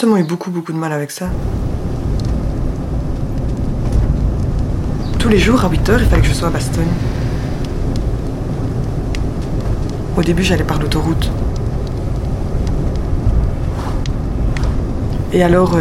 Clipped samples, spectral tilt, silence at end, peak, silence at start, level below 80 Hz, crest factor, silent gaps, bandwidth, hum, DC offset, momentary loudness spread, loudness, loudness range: under 0.1%; -6.5 dB/octave; 0 s; 0 dBFS; 0 s; -20 dBFS; 14 dB; none; 14 kHz; none; under 0.1%; 8 LU; -18 LUFS; 5 LU